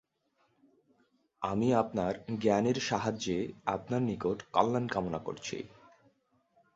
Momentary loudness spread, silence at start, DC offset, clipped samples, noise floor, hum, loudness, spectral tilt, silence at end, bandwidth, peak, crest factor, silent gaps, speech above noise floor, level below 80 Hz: 10 LU; 1.4 s; under 0.1%; under 0.1%; -75 dBFS; none; -32 LUFS; -5.5 dB/octave; 1.1 s; 8 kHz; -10 dBFS; 24 dB; none; 43 dB; -62 dBFS